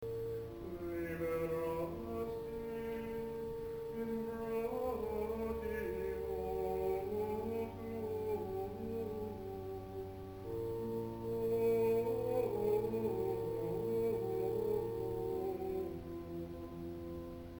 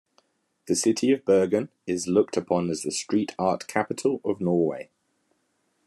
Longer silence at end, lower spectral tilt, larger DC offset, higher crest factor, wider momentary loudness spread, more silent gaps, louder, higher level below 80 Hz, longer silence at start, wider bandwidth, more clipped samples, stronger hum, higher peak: second, 0 s vs 1.05 s; first, -8 dB/octave vs -5 dB/octave; neither; about the same, 14 dB vs 18 dB; first, 10 LU vs 7 LU; neither; second, -40 LUFS vs -25 LUFS; first, -58 dBFS vs -72 dBFS; second, 0 s vs 0.65 s; first, 19 kHz vs 13 kHz; neither; neither; second, -24 dBFS vs -6 dBFS